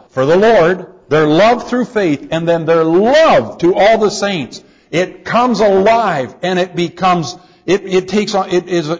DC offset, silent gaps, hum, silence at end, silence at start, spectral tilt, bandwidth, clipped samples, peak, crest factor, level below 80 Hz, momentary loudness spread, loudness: under 0.1%; none; none; 0 s; 0.15 s; -5.5 dB/octave; 7.8 kHz; under 0.1%; -2 dBFS; 10 dB; -48 dBFS; 9 LU; -13 LUFS